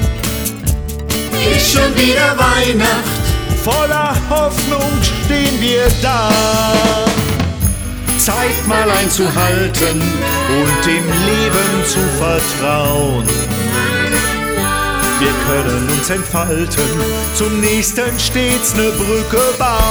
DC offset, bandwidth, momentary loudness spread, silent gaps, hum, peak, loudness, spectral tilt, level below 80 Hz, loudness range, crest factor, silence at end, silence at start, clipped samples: under 0.1%; over 20 kHz; 5 LU; none; none; -2 dBFS; -14 LUFS; -4 dB/octave; -24 dBFS; 2 LU; 12 dB; 0 s; 0 s; under 0.1%